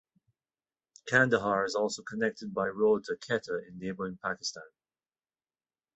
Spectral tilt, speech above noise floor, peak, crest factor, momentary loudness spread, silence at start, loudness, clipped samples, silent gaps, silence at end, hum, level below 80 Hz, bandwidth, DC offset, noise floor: -4.5 dB/octave; over 59 dB; -8 dBFS; 24 dB; 12 LU; 1.05 s; -31 LUFS; under 0.1%; none; 1.3 s; none; -70 dBFS; 8.2 kHz; under 0.1%; under -90 dBFS